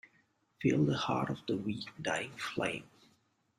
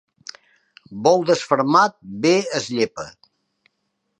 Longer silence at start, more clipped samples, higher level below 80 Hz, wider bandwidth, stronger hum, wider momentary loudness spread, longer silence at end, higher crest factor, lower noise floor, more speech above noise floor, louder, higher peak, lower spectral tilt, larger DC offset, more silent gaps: second, 0.6 s vs 0.9 s; neither; about the same, -70 dBFS vs -66 dBFS; first, 13 kHz vs 10.5 kHz; neither; second, 8 LU vs 22 LU; second, 0.75 s vs 1.1 s; about the same, 18 dB vs 20 dB; about the same, -73 dBFS vs -74 dBFS; second, 39 dB vs 55 dB; second, -35 LUFS vs -19 LUFS; second, -18 dBFS vs -2 dBFS; about the same, -5.5 dB/octave vs -4.5 dB/octave; neither; neither